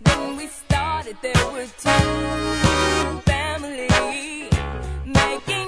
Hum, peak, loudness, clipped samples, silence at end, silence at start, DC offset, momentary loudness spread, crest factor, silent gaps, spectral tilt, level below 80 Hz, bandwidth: none; -2 dBFS; -21 LUFS; under 0.1%; 0 s; 0 s; under 0.1%; 8 LU; 18 dB; none; -4.5 dB/octave; -30 dBFS; 11 kHz